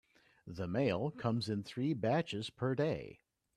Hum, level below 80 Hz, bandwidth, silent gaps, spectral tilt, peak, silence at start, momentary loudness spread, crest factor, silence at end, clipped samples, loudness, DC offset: none; -68 dBFS; 12 kHz; none; -7 dB/octave; -20 dBFS; 0.45 s; 9 LU; 18 dB; 0.4 s; under 0.1%; -37 LUFS; under 0.1%